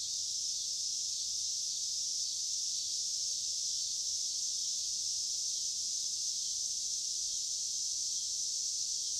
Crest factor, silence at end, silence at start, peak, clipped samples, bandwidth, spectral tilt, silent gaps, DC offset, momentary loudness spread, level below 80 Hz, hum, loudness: 14 dB; 0 s; 0 s; -22 dBFS; under 0.1%; 16 kHz; 3.5 dB/octave; none; under 0.1%; 1 LU; -74 dBFS; none; -33 LUFS